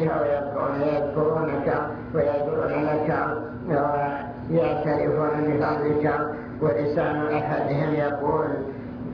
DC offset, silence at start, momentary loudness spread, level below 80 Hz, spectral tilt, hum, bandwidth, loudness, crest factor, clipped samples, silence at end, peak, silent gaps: under 0.1%; 0 s; 5 LU; -50 dBFS; -10 dB/octave; none; 5.4 kHz; -25 LUFS; 14 dB; under 0.1%; 0 s; -10 dBFS; none